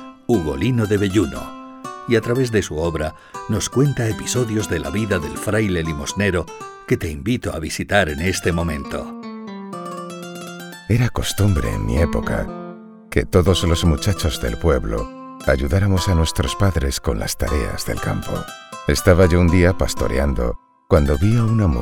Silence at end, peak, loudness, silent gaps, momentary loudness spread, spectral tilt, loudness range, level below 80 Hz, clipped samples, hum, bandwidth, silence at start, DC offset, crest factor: 0 s; 0 dBFS; -20 LUFS; none; 15 LU; -5.5 dB/octave; 4 LU; -30 dBFS; under 0.1%; none; 18 kHz; 0 s; under 0.1%; 18 dB